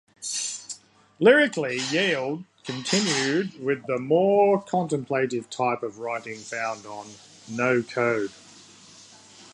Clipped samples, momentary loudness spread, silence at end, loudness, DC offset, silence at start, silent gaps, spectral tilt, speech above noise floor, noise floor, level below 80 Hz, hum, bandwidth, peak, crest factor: under 0.1%; 16 LU; 0.05 s; -24 LUFS; under 0.1%; 0.2 s; none; -4 dB/octave; 26 dB; -50 dBFS; -74 dBFS; none; 11.5 kHz; -6 dBFS; 20 dB